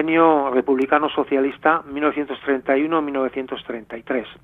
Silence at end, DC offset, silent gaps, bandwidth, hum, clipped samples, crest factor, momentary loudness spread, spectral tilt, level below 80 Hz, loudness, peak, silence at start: 0.1 s; under 0.1%; none; 4.1 kHz; none; under 0.1%; 18 dB; 13 LU; -7.5 dB/octave; -58 dBFS; -20 LUFS; -2 dBFS; 0 s